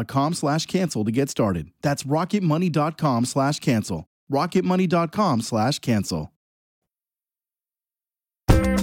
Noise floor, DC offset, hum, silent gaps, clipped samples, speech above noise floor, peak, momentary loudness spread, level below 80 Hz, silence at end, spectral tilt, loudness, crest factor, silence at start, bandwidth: under -90 dBFS; under 0.1%; none; 4.07-4.27 s, 6.36-6.82 s; under 0.1%; over 68 dB; -4 dBFS; 6 LU; -36 dBFS; 0 s; -6 dB/octave; -23 LUFS; 20 dB; 0 s; 17 kHz